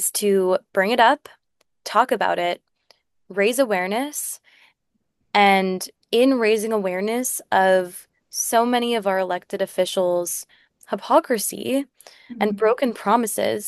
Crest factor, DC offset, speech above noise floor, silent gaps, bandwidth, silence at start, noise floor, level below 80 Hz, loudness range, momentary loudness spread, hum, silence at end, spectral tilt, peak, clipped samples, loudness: 18 dB; under 0.1%; 53 dB; none; 13 kHz; 0 s; -73 dBFS; -72 dBFS; 3 LU; 13 LU; none; 0 s; -3.5 dB/octave; -2 dBFS; under 0.1%; -21 LUFS